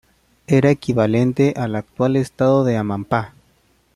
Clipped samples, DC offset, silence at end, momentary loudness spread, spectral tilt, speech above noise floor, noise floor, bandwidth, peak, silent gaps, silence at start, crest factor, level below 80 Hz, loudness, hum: under 0.1%; under 0.1%; 0.7 s; 7 LU; -8 dB/octave; 42 dB; -59 dBFS; 12 kHz; -2 dBFS; none; 0.5 s; 16 dB; -52 dBFS; -18 LUFS; none